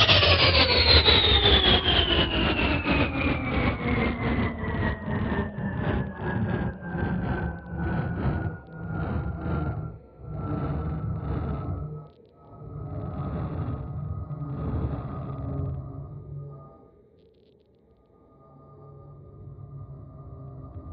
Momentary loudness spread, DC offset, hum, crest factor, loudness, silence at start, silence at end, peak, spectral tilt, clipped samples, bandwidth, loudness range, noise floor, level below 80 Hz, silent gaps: 24 LU; under 0.1%; none; 22 dB; -25 LUFS; 0 s; 0 s; -6 dBFS; -3 dB/octave; under 0.1%; 6.2 kHz; 21 LU; -60 dBFS; -36 dBFS; none